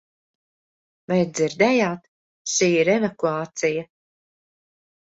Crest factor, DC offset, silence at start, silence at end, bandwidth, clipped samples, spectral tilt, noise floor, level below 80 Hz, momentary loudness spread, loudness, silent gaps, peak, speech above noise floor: 18 dB; under 0.1%; 1.1 s; 1.2 s; 8 kHz; under 0.1%; -4.5 dB/octave; under -90 dBFS; -66 dBFS; 9 LU; -21 LUFS; 2.08-2.45 s; -6 dBFS; over 69 dB